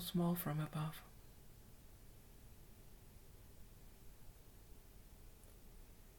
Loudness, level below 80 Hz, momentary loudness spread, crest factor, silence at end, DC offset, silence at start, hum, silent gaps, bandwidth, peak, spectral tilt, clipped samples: -42 LUFS; -62 dBFS; 22 LU; 20 dB; 0 s; under 0.1%; 0 s; none; none; 19 kHz; -28 dBFS; -6 dB/octave; under 0.1%